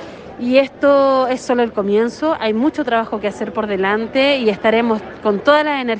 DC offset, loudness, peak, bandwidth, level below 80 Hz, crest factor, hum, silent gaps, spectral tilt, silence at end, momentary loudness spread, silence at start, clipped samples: under 0.1%; -16 LUFS; 0 dBFS; 9 kHz; -52 dBFS; 16 dB; none; none; -5.5 dB/octave; 0 s; 8 LU; 0 s; under 0.1%